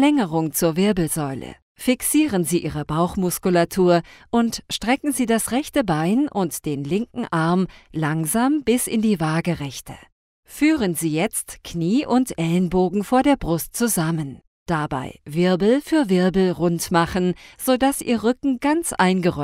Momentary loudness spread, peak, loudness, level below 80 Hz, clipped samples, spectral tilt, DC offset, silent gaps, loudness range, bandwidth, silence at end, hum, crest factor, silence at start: 8 LU; -4 dBFS; -21 LUFS; -46 dBFS; under 0.1%; -5 dB/octave; under 0.1%; 1.62-1.75 s, 10.12-10.43 s, 14.47-14.66 s; 2 LU; 16 kHz; 0 s; none; 16 dB; 0 s